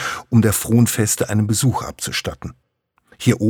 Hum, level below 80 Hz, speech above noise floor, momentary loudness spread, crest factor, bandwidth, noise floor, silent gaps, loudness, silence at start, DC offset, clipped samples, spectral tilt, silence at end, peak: none; -46 dBFS; 40 dB; 11 LU; 16 dB; 19 kHz; -57 dBFS; none; -18 LUFS; 0 s; under 0.1%; under 0.1%; -5 dB/octave; 0 s; -2 dBFS